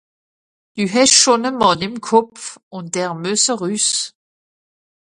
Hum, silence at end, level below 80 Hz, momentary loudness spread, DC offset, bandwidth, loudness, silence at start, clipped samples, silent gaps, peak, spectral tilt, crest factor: none; 1.05 s; -58 dBFS; 19 LU; under 0.1%; 11.5 kHz; -15 LUFS; 0.75 s; under 0.1%; 2.63-2.71 s; 0 dBFS; -2 dB/octave; 18 dB